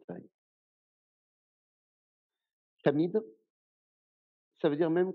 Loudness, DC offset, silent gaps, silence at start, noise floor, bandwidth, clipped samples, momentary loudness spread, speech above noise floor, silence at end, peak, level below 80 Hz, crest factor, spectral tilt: -31 LUFS; under 0.1%; 0.34-2.30 s, 2.53-2.77 s, 3.50-4.51 s; 0.1 s; under -90 dBFS; 4.9 kHz; under 0.1%; 19 LU; over 61 dB; 0 s; -12 dBFS; under -90 dBFS; 24 dB; -6.5 dB/octave